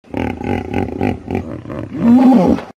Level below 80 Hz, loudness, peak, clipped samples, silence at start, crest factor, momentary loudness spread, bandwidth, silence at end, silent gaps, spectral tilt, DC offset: -38 dBFS; -15 LUFS; 0 dBFS; under 0.1%; 0.15 s; 14 dB; 16 LU; 7.6 kHz; 0.05 s; none; -8.5 dB/octave; under 0.1%